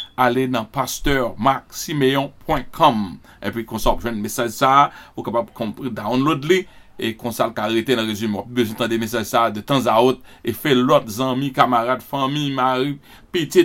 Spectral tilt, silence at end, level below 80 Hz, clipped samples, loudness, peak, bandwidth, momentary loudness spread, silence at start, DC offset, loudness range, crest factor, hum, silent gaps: -5 dB/octave; 0 s; -38 dBFS; under 0.1%; -20 LUFS; 0 dBFS; 16.5 kHz; 11 LU; 0 s; under 0.1%; 3 LU; 20 dB; none; none